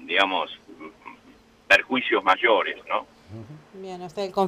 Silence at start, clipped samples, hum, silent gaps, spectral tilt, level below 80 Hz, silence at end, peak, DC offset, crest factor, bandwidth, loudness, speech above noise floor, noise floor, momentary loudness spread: 0 s; under 0.1%; none; none; -4 dB/octave; -64 dBFS; 0 s; -6 dBFS; under 0.1%; 20 dB; 15.5 kHz; -22 LUFS; 30 dB; -54 dBFS; 24 LU